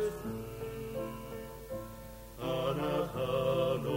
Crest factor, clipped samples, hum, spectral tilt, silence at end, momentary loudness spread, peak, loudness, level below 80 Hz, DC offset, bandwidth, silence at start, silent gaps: 16 dB; under 0.1%; none; -6 dB/octave; 0 s; 13 LU; -20 dBFS; -36 LUFS; -54 dBFS; under 0.1%; 16 kHz; 0 s; none